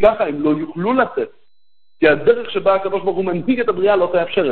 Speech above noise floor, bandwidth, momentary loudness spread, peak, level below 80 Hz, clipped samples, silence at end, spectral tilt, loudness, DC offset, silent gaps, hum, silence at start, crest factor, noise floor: 53 dB; 4.5 kHz; 5 LU; 0 dBFS; -50 dBFS; under 0.1%; 0 s; -9 dB/octave; -17 LUFS; 2%; none; none; 0 s; 16 dB; -70 dBFS